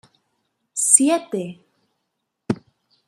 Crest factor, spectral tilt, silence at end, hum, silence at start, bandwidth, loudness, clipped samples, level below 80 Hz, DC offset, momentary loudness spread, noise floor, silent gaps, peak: 24 dB; -3 dB/octave; 0.5 s; none; 0.75 s; 15 kHz; -18 LUFS; under 0.1%; -70 dBFS; under 0.1%; 17 LU; -77 dBFS; none; 0 dBFS